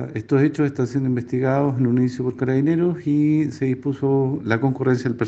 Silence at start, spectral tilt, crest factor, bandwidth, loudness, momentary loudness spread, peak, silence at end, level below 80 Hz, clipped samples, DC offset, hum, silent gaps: 0 s; -9 dB/octave; 16 dB; 7.8 kHz; -21 LUFS; 4 LU; -4 dBFS; 0 s; -60 dBFS; under 0.1%; under 0.1%; none; none